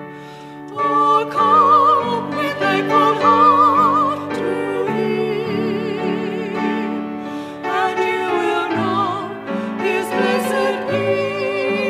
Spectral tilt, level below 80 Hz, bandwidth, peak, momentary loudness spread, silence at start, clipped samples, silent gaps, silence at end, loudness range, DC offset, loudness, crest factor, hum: -5.5 dB/octave; -64 dBFS; 15 kHz; -2 dBFS; 13 LU; 0 s; under 0.1%; none; 0 s; 7 LU; under 0.1%; -17 LUFS; 16 dB; none